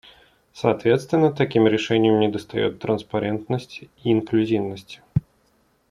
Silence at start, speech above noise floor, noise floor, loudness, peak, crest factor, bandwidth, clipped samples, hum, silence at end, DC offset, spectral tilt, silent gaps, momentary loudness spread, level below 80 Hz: 0.55 s; 42 dB; -63 dBFS; -22 LUFS; -2 dBFS; 20 dB; 11.5 kHz; under 0.1%; none; 0.7 s; under 0.1%; -7 dB/octave; none; 10 LU; -54 dBFS